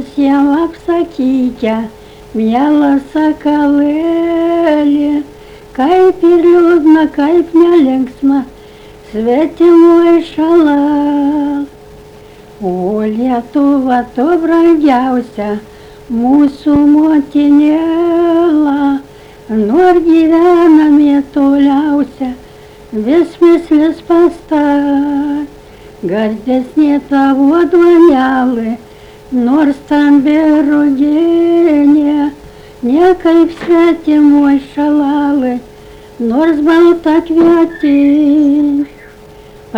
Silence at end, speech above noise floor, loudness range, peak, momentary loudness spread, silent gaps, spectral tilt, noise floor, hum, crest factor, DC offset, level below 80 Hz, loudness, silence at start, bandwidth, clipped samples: 0 s; 26 dB; 3 LU; 0 dBFS; 11 LU; none; -7 dB/octave; -35 dBFS; none; 10 dB; under 0.1%; -42 dBFS; -10 LUFS; 0 s; 7.2 kHz; under 0.1%